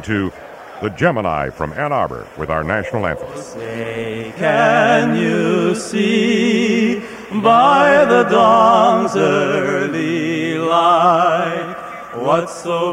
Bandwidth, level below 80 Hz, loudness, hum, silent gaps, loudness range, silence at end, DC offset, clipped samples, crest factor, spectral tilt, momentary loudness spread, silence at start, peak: 15 kHz; -46 dBFS; -15 LUFS; none; none; 8 LU; 0 s; under 0.1%; under 0.1%; 14 dB; -5.5 dB/octave; 15 LU; 0 s; 0 dBFS